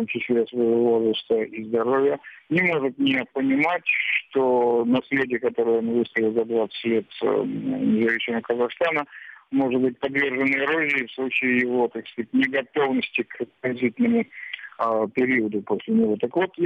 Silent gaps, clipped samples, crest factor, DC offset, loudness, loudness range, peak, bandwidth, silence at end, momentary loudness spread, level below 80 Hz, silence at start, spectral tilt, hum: none; under 0.1%; 14 dB; under 0.1%; -23 LUFS; 2 LU; -10 dBFS; 5.2 kHz; 0 s; 6 LU; -68 dBFS; 0 s; -7.5 dB/octave; none